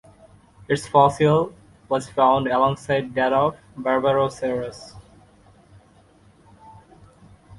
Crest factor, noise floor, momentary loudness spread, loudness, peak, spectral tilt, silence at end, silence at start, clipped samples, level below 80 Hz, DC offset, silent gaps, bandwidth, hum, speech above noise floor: 22 dB; -54 dBFS; 12 LU; -21 LUFS; -2 dBFS; -6 dB/octave; 0.85 s; 0.7 s; under 0.1%; -54 dBFS; under 0.1%; none; 11.5 kHz; none; 34 dB